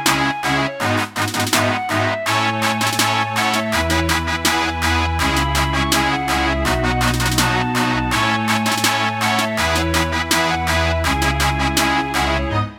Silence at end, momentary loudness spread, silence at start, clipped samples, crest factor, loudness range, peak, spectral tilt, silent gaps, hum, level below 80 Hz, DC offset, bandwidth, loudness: 0 s; 2 LU; 0 s; under 0.1%; 18 dB; 1 LU; 0 dBFS; -3.5 dB/octave; none; none; -30 dBFS; under 0.1%; 19.5 kHz; -17 LUFS